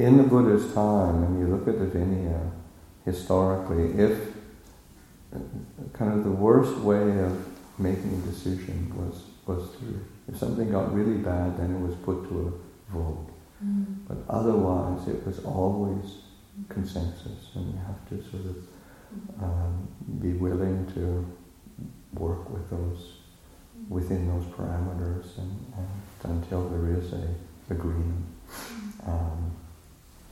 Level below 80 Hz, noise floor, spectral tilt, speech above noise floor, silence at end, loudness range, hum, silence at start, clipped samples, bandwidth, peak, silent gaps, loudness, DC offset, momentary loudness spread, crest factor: -42 dBFS; -52 dBFS; -8.5 dB/octave; 25 dB; 0 s; 8 LU; none; 0 s; under 0.1%; 15.5 kHz; -4 dBFS; none; -28 LUFS; under 0.1%; 17 LU; 24 dB